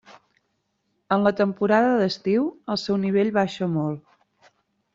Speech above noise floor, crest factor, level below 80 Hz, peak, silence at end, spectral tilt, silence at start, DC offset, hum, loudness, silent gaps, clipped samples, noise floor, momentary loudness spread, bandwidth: 51 dB; 18 dB; -66 dBFS; -6 dBFS; 0.95 s; -7 dB/octave; 0.1 s; under 0.1%; none; -23 LUFS; none; under 0.1%; -73 dBFS; 8 LU; 7.6 kHz